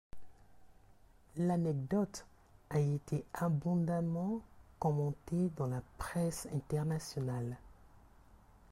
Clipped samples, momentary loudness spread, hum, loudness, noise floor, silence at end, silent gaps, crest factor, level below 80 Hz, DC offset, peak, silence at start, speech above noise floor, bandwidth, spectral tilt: under 0.1%; 7 LU; none; -37 LUFS; -63 dBFS; 0.35 s; none; 14 dB; -60 dBFS; under 0.1%; -24 dBFS; 0.15 s; 28 dB; 15 kHz; -7.5 dB/octave